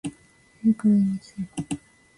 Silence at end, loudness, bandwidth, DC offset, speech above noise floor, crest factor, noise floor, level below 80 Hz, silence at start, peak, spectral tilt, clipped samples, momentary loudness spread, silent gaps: 0.4 s; -25 LUFS; 11.5 kHz; under 0.1%; 33 dB; 14 dB; -56 dBFS; -60 dBFS; 0.05 s; -10 dBFS; -7 dB/octave; under 0.1%; 15 LU; none